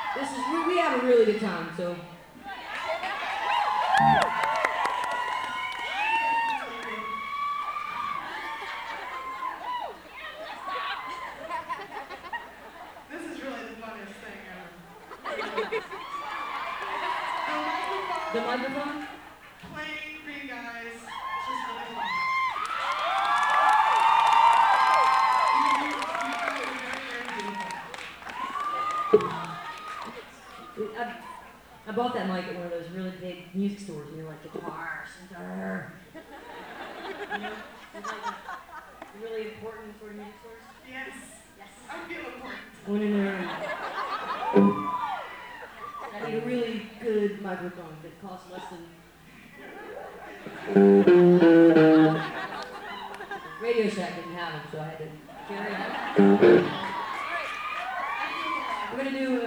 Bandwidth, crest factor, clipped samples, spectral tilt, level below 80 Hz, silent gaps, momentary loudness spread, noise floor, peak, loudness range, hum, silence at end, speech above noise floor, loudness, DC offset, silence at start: over 20 kHz; 22 dB; under 0.1%; -6 dB/octave; -64 dBFS; none; 21 LU; -51 dBFS; -6 dBFS; 17 LU; none; 0 s; 27 dB; -26 LUFS; under 0.1%; 0 s